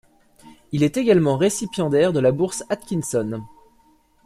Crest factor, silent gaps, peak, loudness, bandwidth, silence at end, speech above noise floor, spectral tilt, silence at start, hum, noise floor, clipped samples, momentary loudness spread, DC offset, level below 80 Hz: 18 dB; none; -4 dBFS; -21 LUFS; 15 kHz; 0.8 s; 38 dB; -6 dB/octave; 0.45 s; none; -58 dBFS; under 0.1%; 10 LU; under 0.1%; -56 dBFS